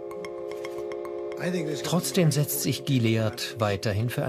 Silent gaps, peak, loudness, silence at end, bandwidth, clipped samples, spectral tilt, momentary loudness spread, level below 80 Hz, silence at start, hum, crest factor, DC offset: none; -10 dBFS; -27 LUFS; 0 s; 15.5 kHz; under 0.1%; -5 dB/octave; 11 LU; -62 dBFS; 0 s; none; 16 dB; under 0.1%